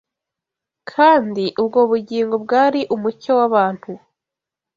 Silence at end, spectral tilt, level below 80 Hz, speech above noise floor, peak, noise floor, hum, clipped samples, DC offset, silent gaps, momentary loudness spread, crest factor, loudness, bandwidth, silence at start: 0.8 s; -6.5 dB/octave; -64 dBFS; 69 dB; -2 dBFS; -86 dBFS; none; under 0.1%; under 0.1%; none; 17 LU; 16 dB; -17 LUFS; 7.4 kHz; 0.95 s